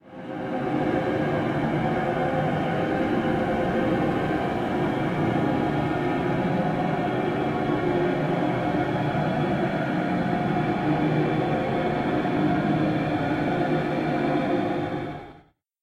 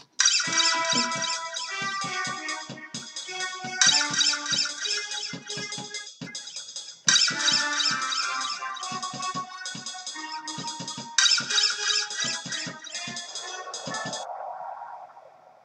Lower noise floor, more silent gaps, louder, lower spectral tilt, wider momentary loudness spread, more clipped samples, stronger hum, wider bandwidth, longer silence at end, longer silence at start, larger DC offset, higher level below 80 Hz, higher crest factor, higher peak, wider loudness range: first, -55 dBFS vs -51 dBFS; neither; about the same, -25 LUFS vs -25 LUFS; first, -8 dB/octave vs 0.5 dB/octave; second, 2 LU vs 16 LU; neither; neither; about the same, 11.5 kHz vs 12.5 kHz; first, 0.45 s vs 0.15 s; about the same, 0.05 s vs 0 s; neither; first, -48 dBFS vs -80 dBFS; second, 14 dB vs 24 dB; second, -12 dBFS vs -4 dBFS; second, 1 LU vs 5 LU